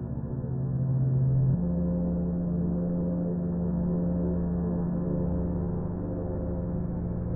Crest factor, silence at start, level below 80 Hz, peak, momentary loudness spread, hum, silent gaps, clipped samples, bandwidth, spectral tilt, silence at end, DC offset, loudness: 12 dB; 0 s; -38 dBFS; -16 dBFS; 7 LU; none; none; under 0.1%; 1.9 kHz; -16 dB/octave; 0 s; 0.2%; -29 LUFS